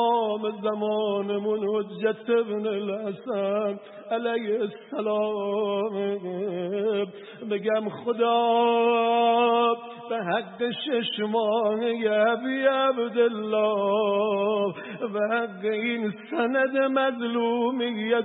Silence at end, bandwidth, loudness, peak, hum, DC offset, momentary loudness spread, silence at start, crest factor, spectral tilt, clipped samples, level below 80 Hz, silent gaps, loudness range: 0 s; 4 kHz; -25 LUFS; -8 dBFS; none; under 0.1%; 9 LU; 0 s; 16 dB; -9.5 dB/octave; under 0.1%; -82 dBFS; none; 5 LU